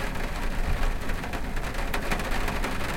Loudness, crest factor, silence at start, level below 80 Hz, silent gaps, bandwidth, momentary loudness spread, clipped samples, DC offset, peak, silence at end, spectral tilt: -31 LUFS; 14 dB; 0 s; -30 dBFS; none; 16.5 kHz; 4 LU; under 0.1%; under 0.1%; -12 dBFS; 0 s; -4.5 dB/octave